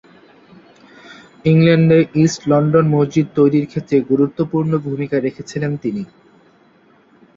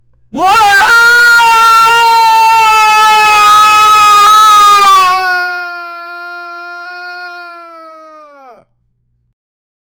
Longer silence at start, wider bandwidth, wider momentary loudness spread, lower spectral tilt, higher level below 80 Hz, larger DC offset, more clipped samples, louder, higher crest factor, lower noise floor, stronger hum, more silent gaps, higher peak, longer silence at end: first, 1.1 s vs 0.35 s; second, 7.6 kHz vs over 20 kHz; second, 11 LU vs 20 LU; first, -7.5 dB/octave vs 0 dB/octave; second, -54 dBFS vs -46 dBFS; neither; neither; second, -16 LUFS vs -5 LUFS; first, 16 dB vs 8 dB; second, -52 dBFS vs -58 dBFS; neither; neither; about the same, -2 dBFS vs 0 dBFS; second, 1.3 s vs 2.35 s